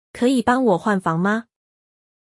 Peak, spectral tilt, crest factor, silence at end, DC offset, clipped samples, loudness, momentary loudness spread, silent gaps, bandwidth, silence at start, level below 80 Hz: -6 dBFS; -6.5 dB/octave; 14 dB; 0.85 s; under 0.1%; under 0.1%; -19 LUFS; 4 LU; none; 12 kHz; 0.15 s; -58 dBFS